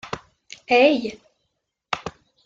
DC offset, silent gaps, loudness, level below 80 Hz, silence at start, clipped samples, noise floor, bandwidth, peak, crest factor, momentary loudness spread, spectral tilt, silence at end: under 0.1%; none; -20 LUFS; -60 dBFS; 0.05 s; under 0.1%; -77 dBFS; 7.8 kHz; -4 dBFS; 20 dB; 21 LU; -4.5 dB/octave; 0.35 s